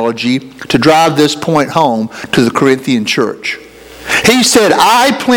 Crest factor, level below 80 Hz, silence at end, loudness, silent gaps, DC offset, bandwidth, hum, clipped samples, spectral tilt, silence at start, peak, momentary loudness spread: 10 dB; -46 dBFS; 0 s; -10 LUFS; none; under 0.1%; over 20 kHz; none; 0.5%; -3.5 dB/octave; 0 s; 0 dBFS; 10 LU